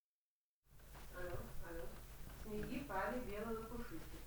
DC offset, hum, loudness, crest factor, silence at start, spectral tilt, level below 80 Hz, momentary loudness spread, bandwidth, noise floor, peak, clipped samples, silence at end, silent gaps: under 0.1%; none; -48 LUFS; 18 dB; 0.7 s; -5.5 dB/octave; -56 dBFS; 13 LU; over 20 kHz; under -90 dBFS; -30 dBFS; under 0.1%; 0 s; none